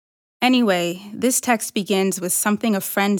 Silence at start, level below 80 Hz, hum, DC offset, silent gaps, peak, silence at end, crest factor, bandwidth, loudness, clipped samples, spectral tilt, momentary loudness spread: 0.4 s; -74 dBFS; none; under 0.1%; none; -6 dBFS; 0 s; 14 dB; over 20 kHz; -20 LUFS; under 0.1%; -3.5 dB/octave; 4 LU